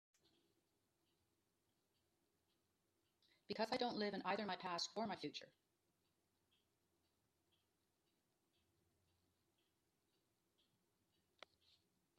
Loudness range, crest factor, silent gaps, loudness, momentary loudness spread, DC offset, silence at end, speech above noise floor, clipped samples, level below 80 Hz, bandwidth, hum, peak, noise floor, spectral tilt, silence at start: 9 LU; 26 dB; none; -46 LUFS; 9 LU; under 0.1%; 6.7 s; 41 dB; under 0.1%; under -90 dBFS; 11.5 kHz; none; -28 dBFS; -87 dBFS; -4 dB/octave; 3.5 s